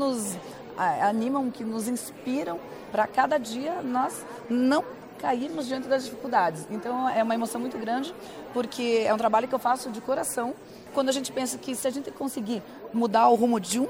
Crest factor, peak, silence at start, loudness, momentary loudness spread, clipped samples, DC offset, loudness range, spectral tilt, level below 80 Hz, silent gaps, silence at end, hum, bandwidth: 20 dB; -8 dBFS; 0 s; -27 LUFS; 10 LU; under 0.1%; under 0.1%; 2 LU; -4 dB/octave; -68 dBFS; none; 0 s; none; 17 kHz